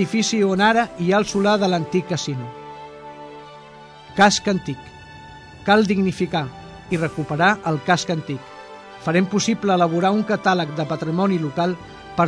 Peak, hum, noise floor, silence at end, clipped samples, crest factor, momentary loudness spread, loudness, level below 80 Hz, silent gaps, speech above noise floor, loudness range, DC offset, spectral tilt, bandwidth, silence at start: -2 dBFS; none; -42 dBFS; 0 s; under 0.1%; 18 dB; 22 LU; -20 LUFS; -52 dBFS; none; 23 dB; 3 LU; under 0.1%; -5 dB/octave; 10.5 kHz; 0 s